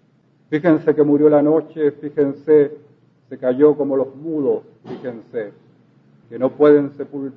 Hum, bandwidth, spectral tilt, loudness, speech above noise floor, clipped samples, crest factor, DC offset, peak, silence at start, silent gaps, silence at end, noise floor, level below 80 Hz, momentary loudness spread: none; 4.2 kHz; -10.5 dB/octave; -17 LUFS; 40 dB; under 0.1%; 16 dB; under 0.1%; -2 dBFS; 0.5 s; none; 0.05 s; -57 dBFS; -68 dBFS; 16 LU